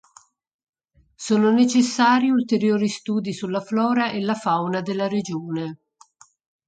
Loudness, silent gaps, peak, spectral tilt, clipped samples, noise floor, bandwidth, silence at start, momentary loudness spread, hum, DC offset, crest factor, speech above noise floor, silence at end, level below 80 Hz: -21 LUFS; none; -4 dBFS; -5 dB/octave; under 0.1%; -55 dBFS; 9.2 kHz; 1.2 s; 11 LU; none; under 0.1%; 18 dB; 34 dB; 0.9 s; -68 dBFS